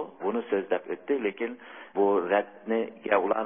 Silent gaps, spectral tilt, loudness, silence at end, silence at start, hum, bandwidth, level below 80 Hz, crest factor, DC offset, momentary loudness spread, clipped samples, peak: none; -9.5 dB/octave; -29 LUFS; 0 s; 0 s; none; 3.6 kHz; -78 dBFS; 18 dB; under 0.1%; 10 LU; under 0.1%; -10 dBFS